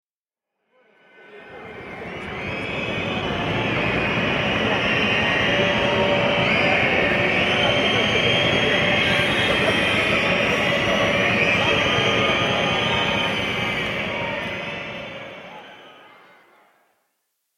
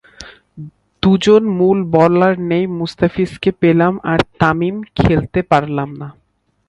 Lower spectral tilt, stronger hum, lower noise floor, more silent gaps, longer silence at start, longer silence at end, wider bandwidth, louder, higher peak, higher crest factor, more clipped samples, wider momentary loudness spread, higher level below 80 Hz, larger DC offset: second, -4.5 dB/octave vs -7.5 dB/octave; neither; first, -89 dBFS vs -39 dBFS; neither; first, 1.25 s vs 0.2 s; first, 1.65 s vs 0.55 s; first, 16 kHz vs 10.5 kHz; second, -19 LUFS vs -15 LUFS; second, -6 dBFS vs 0 dBFS; about the same, 16 dB vs 16 dB; neither; about the same, 14 LU vs 16 LU; second, -46 dBFS vs -38 dBFS; neither